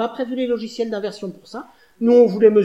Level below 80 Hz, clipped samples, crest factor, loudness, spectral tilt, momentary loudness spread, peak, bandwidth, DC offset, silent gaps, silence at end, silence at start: -64 dBFS; under 0.1%; 16 dB; -18 LUFS; -7 dB/octave; 22 LU; -2 dBFS; 8.2 kHz; under 0.1%; none; 0 s; 0 s